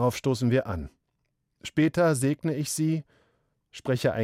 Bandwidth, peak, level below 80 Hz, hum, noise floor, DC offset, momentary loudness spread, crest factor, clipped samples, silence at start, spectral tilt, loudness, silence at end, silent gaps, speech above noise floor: 16 kHz; -12 dBFS; -54 dBFS; none; -77 dBFS; under 0.1%; 14 LU; 16 dB; under 0.1%; 0 s; -6 dB/octave; -27 LUFS; 0 s; none; 51 dB